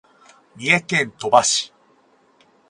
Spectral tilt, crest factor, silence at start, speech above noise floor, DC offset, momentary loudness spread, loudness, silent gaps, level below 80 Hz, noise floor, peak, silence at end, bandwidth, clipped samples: -2 dB/octave; 22 dB; 0.6 s; 39 dB; under 0.1%; 10 LU; -18 LUFS; none; -64 dBFS; -57 dBFS; 0 dBFS; 1.05 s; 11.5 kHz; under 0.1%